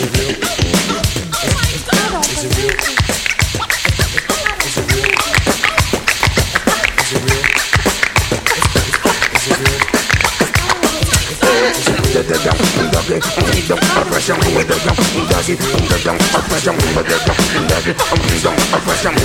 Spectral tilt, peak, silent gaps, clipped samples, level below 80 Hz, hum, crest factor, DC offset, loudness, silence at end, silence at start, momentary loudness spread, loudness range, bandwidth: -3.5 dB/octave; 0 dBFS; none; under 0.1%; -26 dBFS; none; 14 dB; under 0.1%; -13 LUFS; 0 s; 0 s; 3 LU; 2 LU; 18 kHz